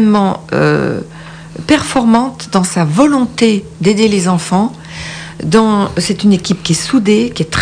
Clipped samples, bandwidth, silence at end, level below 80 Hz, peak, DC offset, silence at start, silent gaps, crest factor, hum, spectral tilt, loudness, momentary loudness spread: under 0.1%; 10 kHz; 0 s; -40 dBFS; 0 dBFS; under 0.1%; 0 s; none; 12 dB; none; -5.5 dB/octave; -12 LUFS; 13 LU